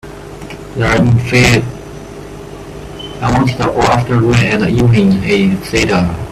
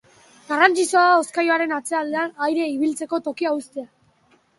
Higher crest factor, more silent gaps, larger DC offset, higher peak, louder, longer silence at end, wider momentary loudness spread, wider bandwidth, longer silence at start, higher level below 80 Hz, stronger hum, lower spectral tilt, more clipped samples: second, 12 dB vs 20 dB; neither; neither; about the same, 0 dBFS vs -2 dBFS; first, -12 LUFS vs -20 LUFS; second, 0 s vs 0.7 s; first, 20 LU vs 11 LU; first, 14 kHz vs 11.5 kHz; second, 0.05 s vs 0.5 s; first, -32 dBFS vs -74 dBFS; neither; first, -6 dB/octave vs -2 dB/octave; neither